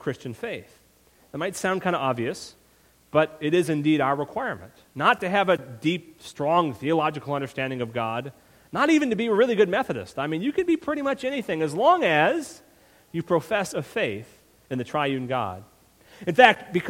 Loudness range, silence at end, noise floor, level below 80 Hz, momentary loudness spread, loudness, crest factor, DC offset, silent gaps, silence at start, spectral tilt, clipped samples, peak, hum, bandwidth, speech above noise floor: 5 LU; 0 s; -59 dBFS; -62 dBFS; 14 LU; -24 LUFS; 24 dB; under 0.1%; none; 0.05 s; -5.5 dB/octave; under 0.1%; 0 dBFS; none; 16.5 kHz; 35 dB